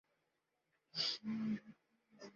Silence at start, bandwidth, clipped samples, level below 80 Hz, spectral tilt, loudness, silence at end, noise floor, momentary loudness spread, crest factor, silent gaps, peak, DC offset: 0.95 s; 7.4 kHz; under 0.1%; -86 dBFS; -3 dB/octave; -41 LUFS; 0.05 s; -86 dBFS; 9 LU; 20 dB; none; -26 dBFS; under 0.1%